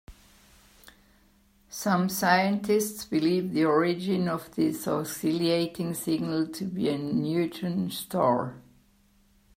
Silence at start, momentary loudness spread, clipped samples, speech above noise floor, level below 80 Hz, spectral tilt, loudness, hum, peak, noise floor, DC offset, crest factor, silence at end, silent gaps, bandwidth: 0.1 s; 7 LU; under 0.1%; 36 dB; -62 dBFS; -5.5 dB/octave; -27 LUFS; none; -6 dBFS; -63 dBFS; under 0.1%; 22 dB; 0.95 s; none; 16 kHz